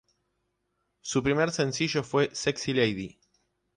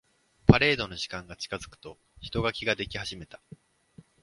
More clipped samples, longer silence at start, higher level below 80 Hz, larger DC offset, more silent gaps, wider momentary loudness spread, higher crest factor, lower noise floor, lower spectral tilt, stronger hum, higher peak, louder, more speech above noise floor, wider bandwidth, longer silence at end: neither; first, 1.05 s vs 0.5 s; second, -58 dBFS vs -46 dBFS; neither; neither; second, 10 LU vs 23 LU; second, 18 dB vs 28 dB; first, -78 dBFS vs -56 dBFS; about the same, -4.5 dB/octave vs -5.5 dB/octave; neither; second, -12 dBFS vs 0 dBFS; about the same, -27 LUFS vs -27 LUFS; first, 51 dB vs 24 dB; about the same, 11 kHz vs 11.5 kHz; second, 0.7 s vs 1 s